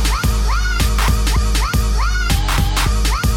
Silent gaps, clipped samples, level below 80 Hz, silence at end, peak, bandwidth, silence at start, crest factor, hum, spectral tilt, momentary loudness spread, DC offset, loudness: none; under 0.1%; -16 dBFS; 0 s; -4 dBFS; 16.5 kHz; 0 s; 12 dB; none; -4 dB/octave; 2 LU; under 0.1%; -17 LUFS